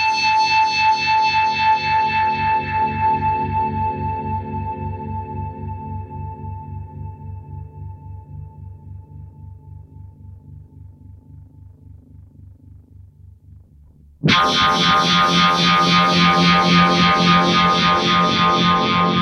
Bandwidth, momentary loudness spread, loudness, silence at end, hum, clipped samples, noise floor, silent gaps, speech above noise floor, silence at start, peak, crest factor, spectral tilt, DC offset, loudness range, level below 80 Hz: 10.5 kHz; 21 LU; -16 LUFS; 0 s; none; under 0.1%; -47 dBFS; none; 33 dB; 0 s; -2 dBFS; 18 dB; -4.5 dB/octave; under 0.1%; 22 LU; -42 dBFS